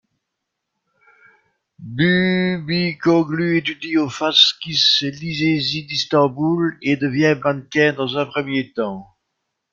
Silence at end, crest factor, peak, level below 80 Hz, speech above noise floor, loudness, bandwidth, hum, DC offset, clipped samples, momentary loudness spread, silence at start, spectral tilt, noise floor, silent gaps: 0.7 s; 18 dB; 0 dBFS; -58 dBFS; 60 dB; -18 LUFS; 7.6 kHz; none; under 0.1%; under 0.1%; 8 LU; 1.8 s; -5 dB/octave; -79 dBFS; none